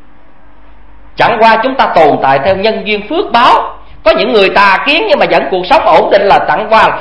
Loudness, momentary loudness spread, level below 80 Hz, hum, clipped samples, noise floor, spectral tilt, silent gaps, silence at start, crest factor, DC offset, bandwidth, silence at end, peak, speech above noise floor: -8 LUFS; 6 LU; -38 dBFS; none; 1%; -42 dBFS; -5.5 dB/octave; none; 1.2 s; 10 dB; 3%; 11 kHz; 0 s; 0 dBFS; 34 dB